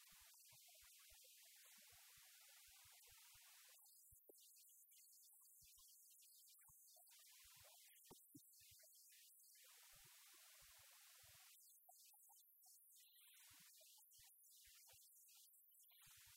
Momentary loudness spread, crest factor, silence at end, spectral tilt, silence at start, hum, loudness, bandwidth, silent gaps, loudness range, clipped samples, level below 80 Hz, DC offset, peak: 2 LU; 16 dB; 0 s; 0 dB/octave; 0 s; none; -66 LUFS; 16 kHz; none; 1 LU; under 0.1%; under -90 dBFS; under 0.1%; -52 dBFS